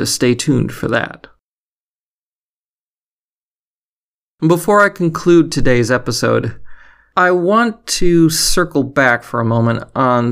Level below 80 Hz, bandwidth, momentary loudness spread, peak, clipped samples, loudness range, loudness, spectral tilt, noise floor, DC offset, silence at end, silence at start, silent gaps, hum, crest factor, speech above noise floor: -34 dBFS; 16 kHz; 6 LU; 0 dBFS; under 0.1%; 10 LU; -14 LUFS; -5 dB/octave; under -90 dBFS; under 0.1%; 0 s; 0 s; 1.41-4.38 s; none; 14 dB; over 77 dB